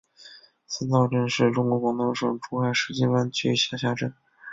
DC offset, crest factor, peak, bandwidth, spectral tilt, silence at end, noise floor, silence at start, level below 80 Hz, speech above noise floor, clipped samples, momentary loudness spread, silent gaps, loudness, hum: under 0.1%; 18 dB; -6 dBFS; 7.8 kHz; -5.5 dB/octave; 0 s; -50 dBFS; 0.2 s; -62 dBFS; 26 dB; under 0.1%; 7 LU; none; -25 LUFS; none